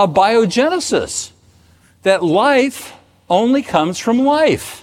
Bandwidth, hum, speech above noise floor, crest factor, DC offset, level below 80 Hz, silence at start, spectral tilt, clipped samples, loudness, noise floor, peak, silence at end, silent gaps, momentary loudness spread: 16.5 kHz; none; 36 dB; 16 dB; under 0.1%; -52 dBFS; 0 s; -4.5 dB/octave; under 0.1%; -15 LUFS; -50 dBFS; 0 dBFS; 0.05 s; none; 10 LU